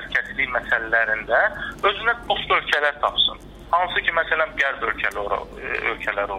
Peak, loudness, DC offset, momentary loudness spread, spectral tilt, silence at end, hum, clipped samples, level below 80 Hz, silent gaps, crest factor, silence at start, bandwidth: -6 dBFS; -21 LUFS; under 0.1%; 5 LU; -3.5 dB/octave; 0 s; none; under 0.1%; -46 dBFS; none; 16 dB; 0 s; 14.5 kHz